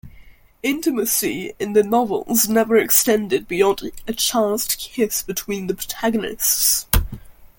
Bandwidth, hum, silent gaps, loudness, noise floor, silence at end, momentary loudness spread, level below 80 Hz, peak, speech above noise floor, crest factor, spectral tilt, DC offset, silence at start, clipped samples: 17 kHz; none; none; -19 LUFS; -45 dBFS; 0.15 s; 11 LU; -36 dBFS; 0 dBFS; 26 dB; 20 dB; -3 dB/octave; under 0.1%; 0.05 s; under 0.1%